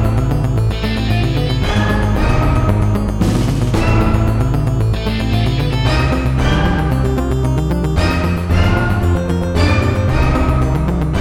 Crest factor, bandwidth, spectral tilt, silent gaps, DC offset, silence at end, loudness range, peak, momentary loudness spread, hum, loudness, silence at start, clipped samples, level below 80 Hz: 12 dB; 15.5 kHz; -7 dB/octave; none; under 0.1%; 0 s; 1 LU; -2 dBFS; 3 LU; none; -15 LUFS; 0 s; under 0.1%; -20 dBFS